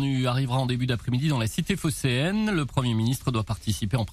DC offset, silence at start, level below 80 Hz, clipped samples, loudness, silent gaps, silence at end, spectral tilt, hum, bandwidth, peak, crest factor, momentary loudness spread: under 0.1%; 0 s; -46 dBFS; under 0.1%; -26 LUFS; none; 0 s; -5.5 dB/octave; none; 14.5 kHz; -10 dBFS; 14 dB; 3 LU